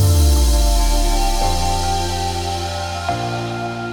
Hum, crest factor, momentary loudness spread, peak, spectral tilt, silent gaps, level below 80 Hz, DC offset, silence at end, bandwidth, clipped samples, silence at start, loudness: none; 12 dB; 8 LU; -4 dBFS; -4.5 dB/octave; none; -18 dBFS; under 0.1%; 0 s; 19 kHz; under 0.1%; 0 s; -19 LUFS